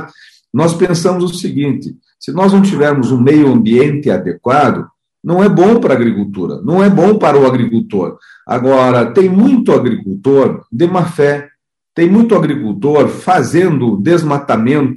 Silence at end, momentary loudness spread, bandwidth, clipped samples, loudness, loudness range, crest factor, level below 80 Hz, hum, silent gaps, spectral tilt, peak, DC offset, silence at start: 0 s; 9 LU; 12 kHz; under 0.1%; -11 LUFS; 2 LU; 10 dB; -52 dBFS; none; none; -7.5 dB/octave; 0 dBFS; under 0.1%; 0 s